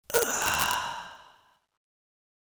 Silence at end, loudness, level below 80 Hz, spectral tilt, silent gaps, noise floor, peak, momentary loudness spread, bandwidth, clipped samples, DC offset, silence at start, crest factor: 1.25 s; -27 LUFS; -58 dBFS; -0.5 dB/octave; none; -62 dBFS; 0 dBFS; 15 LU; over 20 kHz; under 0.1%; under 0.1%; 0.1 s; 32 dB